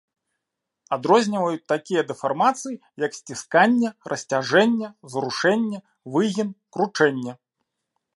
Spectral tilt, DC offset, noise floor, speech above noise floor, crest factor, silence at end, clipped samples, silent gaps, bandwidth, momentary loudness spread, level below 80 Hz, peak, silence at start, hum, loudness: -4.5 dB/octave; under 0.1%; -83 dBFS; 61 dB; 20 dB; 0.8 s; under 0.1%; none; 11.5 kHz; 12 LU; -74 dBFS; -4 dBFS; 0.9 s; none; -22 LUFS